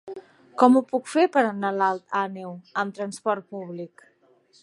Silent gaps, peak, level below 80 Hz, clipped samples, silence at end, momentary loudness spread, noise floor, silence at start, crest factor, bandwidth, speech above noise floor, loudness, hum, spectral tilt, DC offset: none; -2 dBFS; -80 dBFS; under 0.1%; 0.75 s; 20 LU; -60 dBFS; 0.05 s; 22 dB; 11.5 kHz; 36 dB; -23 LUFS; none; -5.5 dB/octave; under 0.1%